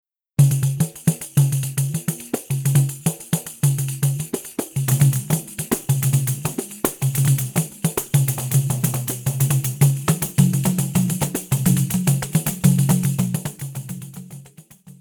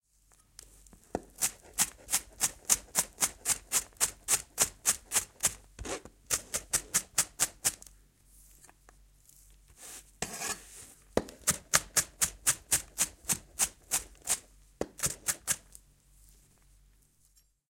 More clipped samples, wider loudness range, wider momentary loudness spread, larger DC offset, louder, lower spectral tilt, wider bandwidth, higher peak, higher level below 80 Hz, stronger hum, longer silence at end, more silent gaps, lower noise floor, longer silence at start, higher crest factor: neither; second, 2 LU vs 8 LU; second, 9 LU vs 15 LU; neither; first, -20 LUFS vs -31 LUFS; first, -5.5 dB/octave vs -0.5 dB/octave; first, over 20 kHz vs 17 kHz; about the same, -2 dBFS vs -4 dBFS; first, -50 dBFS vs -58 dBFS; neither; second, 0.1 s vs 2.1 s; neither; second, -45 dBFS vs -67 dBFS; second, 0.4 s vs 1.15 s; second, 18 dB vs 32 dB